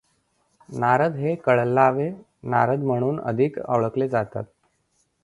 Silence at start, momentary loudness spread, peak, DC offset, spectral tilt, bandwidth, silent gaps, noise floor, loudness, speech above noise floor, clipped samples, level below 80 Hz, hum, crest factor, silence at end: 0.7 s; 12 LU; -2 dBFS; under 0.1%; -8.5 dB/octave; 11.5 kHz; none; -69 dBFS; -22 LUFS; 47 dB; under 0.1%; -62 dBFS; none; 20 dB; 0.8 s